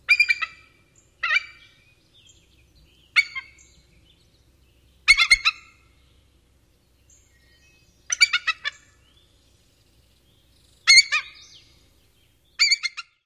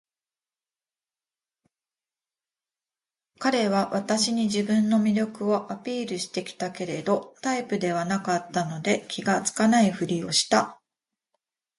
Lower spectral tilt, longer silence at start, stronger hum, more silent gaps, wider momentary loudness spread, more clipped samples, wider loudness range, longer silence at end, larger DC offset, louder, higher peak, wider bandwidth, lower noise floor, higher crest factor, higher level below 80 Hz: second, 3.5 dB/octave vs -4 dB/octave; second, 0.1 s vs 3.4 s; neither; neither; first, 19 LU vs 9 LU; neither; first, 7 LU vs 4 LU; second, 0.25 s vs 1.05 s; neither; first, -19 LUFS vs -25 LUFS; first, -2 dBFS vs -6 dBFS; first, 15.5 kHz vs 11.5 kHz; second, -61 dBFS vs under -90 dBFS; about the same, 24 dB vs 20 dB; first, -56 dBFS vs -70 dBFS